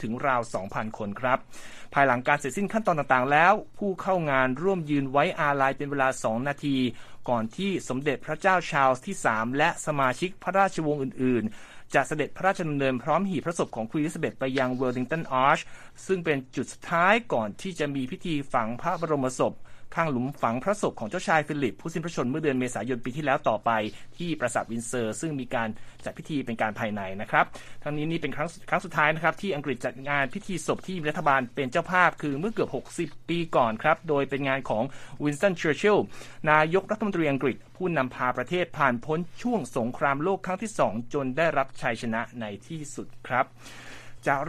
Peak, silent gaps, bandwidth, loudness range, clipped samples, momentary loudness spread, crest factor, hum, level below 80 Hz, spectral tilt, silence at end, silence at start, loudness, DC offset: -4 dBFS; none; 14 kHz; 5 LU; under 0.1%; 9 LU; 22 dB; none; -54 dBFS; -5.5 dB/octave; 0 s; 0 s; -27 LUFS; under 0.1%